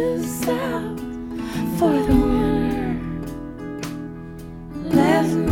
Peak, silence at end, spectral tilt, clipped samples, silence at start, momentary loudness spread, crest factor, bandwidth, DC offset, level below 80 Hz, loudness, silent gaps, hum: -4 dBFS; 0 s; -6.5 dB/octave; under 0.1%; 0 s; 15 LU; 18 dB; 17 kHz; under 0.1%; -34 dBFS; -22 LUFS; none; none